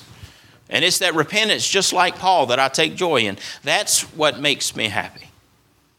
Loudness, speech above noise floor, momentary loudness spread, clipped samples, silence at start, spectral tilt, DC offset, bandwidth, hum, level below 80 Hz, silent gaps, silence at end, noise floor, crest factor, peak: -18 LUFS; 39 dB; 7 LU; under 0.1%; 0 s; -1.5 dB/octave; under 0.1%; 18.5 kHz; none; -60 dBFS; none; 0.75 s; -59 dBFS; 20 dB; 0 dBFS